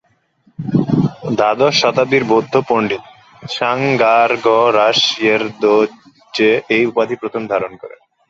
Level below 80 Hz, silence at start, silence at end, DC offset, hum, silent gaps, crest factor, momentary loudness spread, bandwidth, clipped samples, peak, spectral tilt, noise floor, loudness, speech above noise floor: -54 dBFS; 0.6 s; 0.4 s; under 0.1%; none; none; 14 dB; 9 LU; 7.8 kHz; under 0.1%; -2 dBFS; -5 dB/octave; -56 dBFS; -14 LUFS; 42 dB